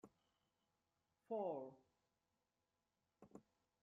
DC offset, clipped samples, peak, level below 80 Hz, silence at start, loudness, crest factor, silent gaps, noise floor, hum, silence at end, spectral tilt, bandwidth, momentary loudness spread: under 0.1%; under 0.1%; -34 dBFS; under -90 dBFS; 0.05 s; -49 LUFS; 20 dB; none; under -90 dBFS; none; 0.4 s; -7.5 dB/octave; 6.6 kHz; 20 LU